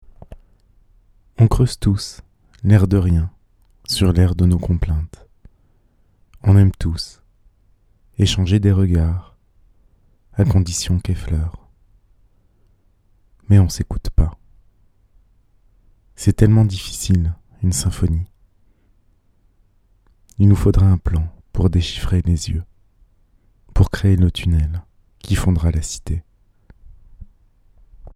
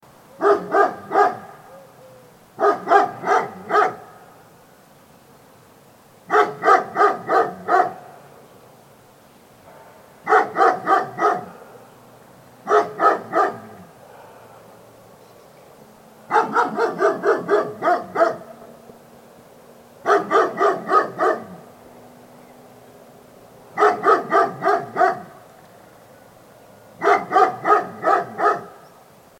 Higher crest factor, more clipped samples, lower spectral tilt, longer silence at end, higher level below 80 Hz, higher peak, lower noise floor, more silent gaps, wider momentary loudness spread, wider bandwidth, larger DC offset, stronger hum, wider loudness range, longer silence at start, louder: about the same, 18 dB vs 22 dB; neither; first, -6.5 dB/octave vs -5 dB/octave; second, 0.05 s vs 0.7 s; first, -28 dBFS vs -70 dBFS; about the same, 0 dBFS vs 0 dBFS; first, -57 dBFS vs -50 dBFS; neither; about the same, 14 LU vs 12 LU; second, 13.5 kHz vs 16.5 kHz; neither; neither; about the same, 5 LU vs 4 LU; about the same, 0.3 s vs 0.4 s; about the same, -18 LUFS vs -19 LUFS